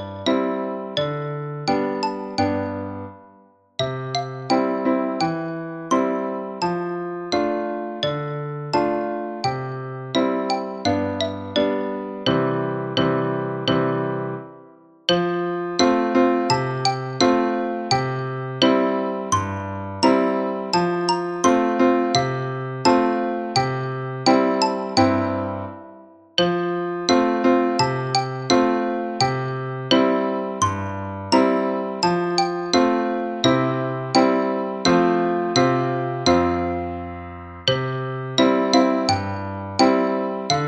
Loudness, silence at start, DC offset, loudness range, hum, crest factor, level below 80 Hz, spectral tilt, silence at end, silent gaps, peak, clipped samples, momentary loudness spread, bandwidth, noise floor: -21 LUFS; 0 s; under 0.1%; 5 LU; none; 18 dB; -54 dBFS; -5 dB/octave; 0 s; none; -2 dBFS; under 0.1%; 10 LU; 10 kHz; -53 dBFS